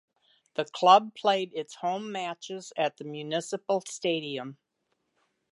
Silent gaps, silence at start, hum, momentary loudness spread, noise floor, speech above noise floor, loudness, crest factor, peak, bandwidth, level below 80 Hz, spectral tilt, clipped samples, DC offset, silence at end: none; 0.6 s; none; 17 LU; -78 dBFS; 50 dB; -28 LUFS; 24 dB; -4 dBFS; 11.5 kHz; -86 dBFS; -3.5 dB/octave; under 0.1%; under 0.1%; 1 s